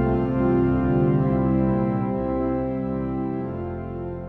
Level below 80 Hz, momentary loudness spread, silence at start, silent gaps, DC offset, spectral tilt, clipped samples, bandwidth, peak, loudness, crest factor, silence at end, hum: -36 dBFS; 10 LU; 0 s; none; under 0.1%; -12 dB/octave; under 0.1%; 4.2 kHz; -10 dBFS; -23 LUFS; 12 dB; 0 s; none